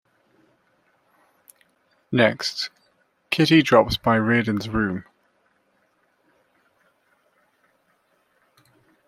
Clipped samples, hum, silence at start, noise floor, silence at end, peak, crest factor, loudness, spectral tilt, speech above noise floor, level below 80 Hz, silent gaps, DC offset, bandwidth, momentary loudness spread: under 0.1%; none; 2.1 s; -66 dBFS; 4.05 s; -2 dBFS; 24 dB; -20 LUFS; -5.5 dB/octave; 47 dB; -52 dBFS; none; under 0.1%; 15 kHz; 12 LU